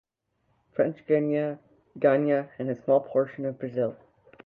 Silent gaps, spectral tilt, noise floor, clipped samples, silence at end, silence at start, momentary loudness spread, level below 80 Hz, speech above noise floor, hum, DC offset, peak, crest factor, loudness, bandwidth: none; -10.5 dB/octave; -74 dBFS; under 0.1%; 0.5 s; 0.8 s; 10 LU; -74 dBFS; 48 dB; none; under 0.1%; -8 dBFS; 18 dB; -27 LUFS; 4.2 kHz